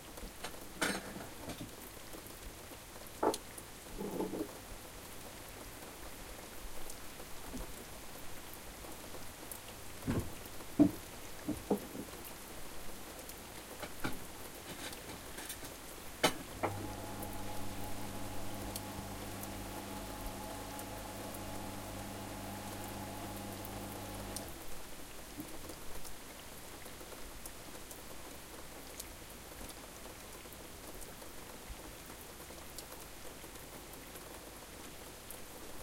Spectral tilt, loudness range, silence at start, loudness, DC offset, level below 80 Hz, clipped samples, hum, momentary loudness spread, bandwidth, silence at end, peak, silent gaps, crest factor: -4 dB/octave; 10 LU; 0 s; -44 LUFS; under 0.1%; -56 dBFS; under 0.1%; none; 10 LU; 17 kHz; 0 s; -14 dBFS; none; 28 dB